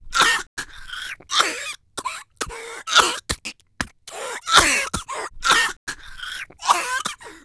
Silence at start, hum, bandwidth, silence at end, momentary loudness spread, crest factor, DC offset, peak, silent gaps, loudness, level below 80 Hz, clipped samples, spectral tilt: 0 s; none; 11 kHz; 0.05 s; 17 LU; 24 dB; under 0.1%; 0 dBFS; 0.47-0.57 s, 5.77-5.87 s; -21 LUFS; -44 dBFS; under 0.1%; -0.5 dB/octave